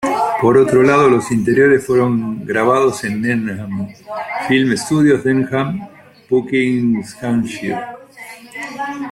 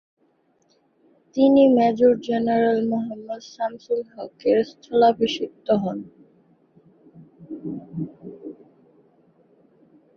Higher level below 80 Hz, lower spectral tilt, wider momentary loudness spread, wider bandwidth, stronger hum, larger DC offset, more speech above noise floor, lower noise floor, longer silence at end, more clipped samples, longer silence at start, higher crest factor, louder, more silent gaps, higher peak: first, -52 dBFS vs -64 dBFS; about the same, -6 dB/octave vs -7 dB/octave; second, 16 LU vs 19 LU; first, 14 kHz vs 6.8 kHz; neither; neither; second, 22 dB vs 44 dB; second, -37 dBFS vs -64 dBFS; second, 0 s vs 1.65 s; neither; second, 0 s vs 1.35 s; about the same, 14 dB vs 18 dB; first, -15 LUFS vs -21 LUFS; neither; first, -2 dBFS vs -6 dBFS